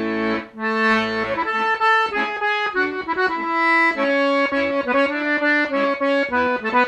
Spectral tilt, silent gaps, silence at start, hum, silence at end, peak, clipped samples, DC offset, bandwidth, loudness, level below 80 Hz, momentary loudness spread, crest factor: -4.5 dB/octave; none; 0 s; none; 0 s; -6 dBFS; under 0.1%; under 0.1%; 9.8 kHz; -19 LUFS; -56 dBFS; 5 LU; 14 dB